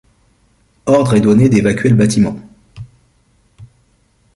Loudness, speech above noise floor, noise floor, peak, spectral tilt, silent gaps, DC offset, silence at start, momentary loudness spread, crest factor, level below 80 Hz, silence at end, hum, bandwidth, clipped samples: -12 LUFS; 45 dB; -56 dBFS; 0 dBFS; -7 dB/octave; none; under 0.1%; 0.85 s; 9 LU; 14 dB; -44 dBFS; 0.7 s; none; 11.5 kHz; under 0.1%